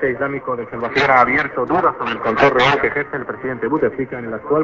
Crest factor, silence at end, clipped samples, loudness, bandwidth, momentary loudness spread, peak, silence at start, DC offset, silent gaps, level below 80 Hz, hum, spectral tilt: 18 dB; 0 s; under 0.1%; -17 LUFS; 7.6 kHz; 12 LU; 0 dBFS; 0 s; under 0.1%; none; -48 dBFS; none; -6 dB/octave